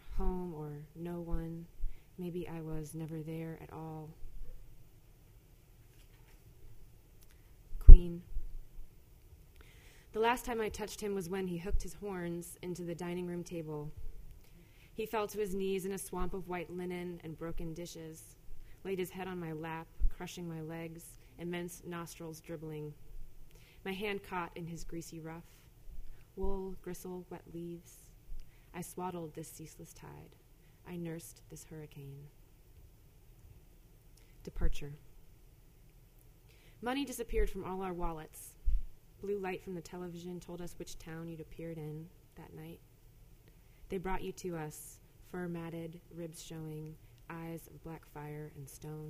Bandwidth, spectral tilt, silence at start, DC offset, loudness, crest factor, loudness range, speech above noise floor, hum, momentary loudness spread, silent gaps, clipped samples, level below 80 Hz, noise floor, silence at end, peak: 14.5 kHz; -6 dB/octave; 0.05 s; under 0.1%; -39 LUFS; 32 dB; 18 LU; 20 dB; none; 19 LU; none; under 0.1%; -34 dBFS; -60 dBFS; 0 s; -2 dBFS